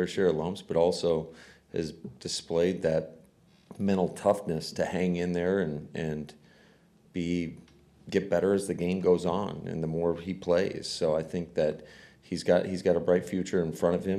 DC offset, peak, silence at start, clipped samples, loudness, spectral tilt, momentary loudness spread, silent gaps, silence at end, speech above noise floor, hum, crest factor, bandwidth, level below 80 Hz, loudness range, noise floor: under 0.1%; -12 dBFS; 0 s; under 0.1%; -29 LUFS; -6 dB/octave; 9 LU; none; 0 s; 32 dB; none; 18 dB; 13.5 kHz; -58 dBFS; 3 LU; -60 dBFS